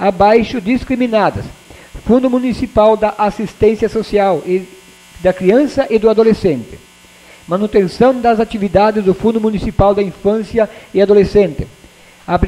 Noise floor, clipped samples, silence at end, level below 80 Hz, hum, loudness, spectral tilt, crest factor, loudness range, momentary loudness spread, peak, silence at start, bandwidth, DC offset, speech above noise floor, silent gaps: -42 dBFS; under 0.1%; 0 s; -34 dBFS; none; -13 LUFS; -7 dB/octave; 14 dB; 1 LU; 8 LU; 0 dBFS; 0 s; 13.5 kHz; under 0.1%; 29 dB; none